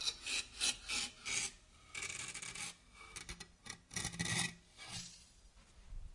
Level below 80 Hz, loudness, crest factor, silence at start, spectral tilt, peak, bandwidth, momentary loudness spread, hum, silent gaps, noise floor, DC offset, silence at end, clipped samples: -60 dBFS; -41 LUFS; 24 dB; 0 s; -1 dB/octave; -20 dBFS; 11.5 kHz; 17 LU; none; none; -63 dBFS; under 0.1%; 0 s; under 0.1%